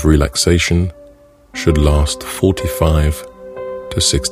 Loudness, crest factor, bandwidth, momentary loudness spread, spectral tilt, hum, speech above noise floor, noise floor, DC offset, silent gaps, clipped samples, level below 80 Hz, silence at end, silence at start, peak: -15 LUFS; 16 dB; 16 kHz; 14 LU; -4.5 dB/octave; none; 30 dB; -44 dBFS; under 0.1%; none; under 0.1%; -22 dBFS; 0 s; 0 s; 0 dBFS